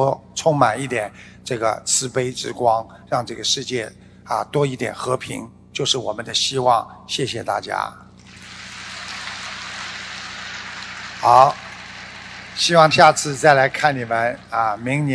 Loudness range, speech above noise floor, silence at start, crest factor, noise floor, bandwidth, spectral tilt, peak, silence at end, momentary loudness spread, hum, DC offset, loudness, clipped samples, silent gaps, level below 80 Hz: 11 LU; 22 dB; 0 s; 20 dB; -41 dBFS; 11 kHz; -3.5 dB/octave; 0 dBFS; 0 s; 18 LU; 60 Hz at -50 dBFS; under 0.1%; -19 LUFS; under 0.1%; none; -56 dBFS